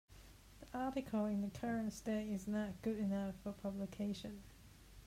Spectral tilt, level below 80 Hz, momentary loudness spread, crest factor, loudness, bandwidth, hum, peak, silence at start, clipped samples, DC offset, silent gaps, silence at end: -6.5 dB/octave; -64 dBFS; 21 LU; 14 dB; -42 LUFS; 16 kHz; none; -30 dBFS; 0.1 s; under 0.1%; under 0.1%; none; 0 s